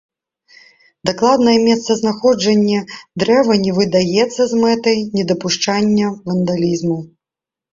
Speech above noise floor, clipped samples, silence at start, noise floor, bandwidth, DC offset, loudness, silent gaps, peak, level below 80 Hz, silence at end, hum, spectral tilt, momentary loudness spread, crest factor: 73 dB; under 0.1%; 1.05 s; -87 dBFS; 7.6 kHz; under 0.1%; -15 LUFS; none; 0 dBFS; -54 dBFS; 0.7 s; none; -5 dB/octave; 8 LU; 16 dB